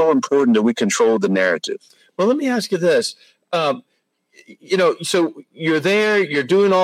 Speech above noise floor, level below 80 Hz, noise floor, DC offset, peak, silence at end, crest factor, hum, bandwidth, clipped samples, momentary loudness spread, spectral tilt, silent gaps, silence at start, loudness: 42 dB; -70 dBFS; -60 dBFS; under 0.1%; -4 dBFS; 0 s; 14 dB; none; 15.5 kHz; under 0.1%; 9 LU; -4.5 dB/octave; none; 0 s; -18 LUFS